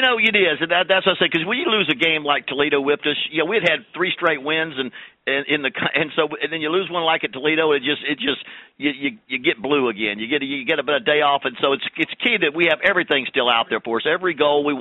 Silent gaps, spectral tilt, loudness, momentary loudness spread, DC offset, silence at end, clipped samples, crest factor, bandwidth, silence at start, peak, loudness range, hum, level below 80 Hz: none; -6 dB/octave; -19 LUFS; 6 LU; under 0.1%; 0 s; under 0.1%; 18 dB; 8 kHz; 0 s; -2 dBFS; 3 LU; none; -64 dBFS